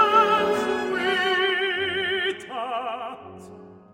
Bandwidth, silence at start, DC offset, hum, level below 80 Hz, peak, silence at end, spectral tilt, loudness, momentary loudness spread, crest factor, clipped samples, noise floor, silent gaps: 16 kHz; 0 s; under 0.1%; none; -64 dBFS; -6 dBFS; 0.15 s; -3.5 dB/octave; -23 LUFS; 16 LU; 18 dB; under 0.1%; -45 dBFS; none